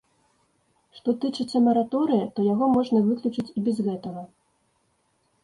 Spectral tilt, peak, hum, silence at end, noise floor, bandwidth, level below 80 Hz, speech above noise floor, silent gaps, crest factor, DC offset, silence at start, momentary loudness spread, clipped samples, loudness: -8 dB/octave; -10 dBFS; none; 1.15 s; -69 dBFS; 11 kHz; -66 dBFS; 46 dB; none; 16 dB; under 0.1%; 0.95 s; 9 LU; under 0.1%; -24 LUFS